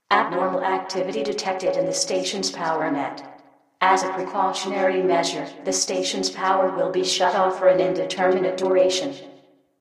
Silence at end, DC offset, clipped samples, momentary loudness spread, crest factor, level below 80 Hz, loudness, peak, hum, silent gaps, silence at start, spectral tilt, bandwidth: 0.45 s; under 0.1%; under 0.1%; 7 LU; 18 dB; -72 dBFS; -22 LUFS; -4 dBFS; none; none; 0.1 s; -3 dB/octave; 13 kHz